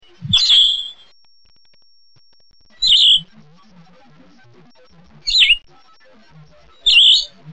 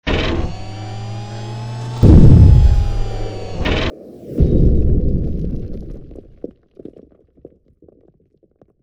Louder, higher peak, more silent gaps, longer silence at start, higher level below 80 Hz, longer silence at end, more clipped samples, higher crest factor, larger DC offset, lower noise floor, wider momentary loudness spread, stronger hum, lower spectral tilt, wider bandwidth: first, -11 LUFS vs -15 LUFS; about the same, -2 dBFS vs 0 dBFS; neither; first, 0.2 s vs 0.05 s; second, -46 dBFS vs -18 dBFS; second, 0 s vs 2.6 s; second, under 0.1% vs 0.6%; about the same, 16 dB vs 14 dB; first, 0.4% vs under 0.1%; about the same, -56 dBFS vs -57 dBFS; second, 10 LU vs 26 LU; neither; second, 0.5 dB/octave vs -8 dB/octave; about the same, 9 kHz vs 8.2 kHz